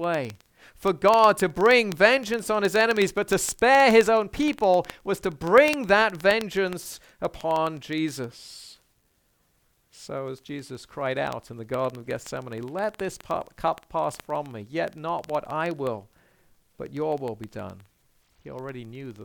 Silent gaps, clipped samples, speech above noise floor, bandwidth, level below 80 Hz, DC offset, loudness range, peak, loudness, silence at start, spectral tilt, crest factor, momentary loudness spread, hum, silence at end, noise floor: none; under 0.1%; 44 dB; 19 kHz; -56 dBFS; under 0.1%; 14 LU; -2 dBFS; -24 LUFS; 0 s; -4 dB/octave; 22 dB; 19 LU; none; 0 s; -68 dBFS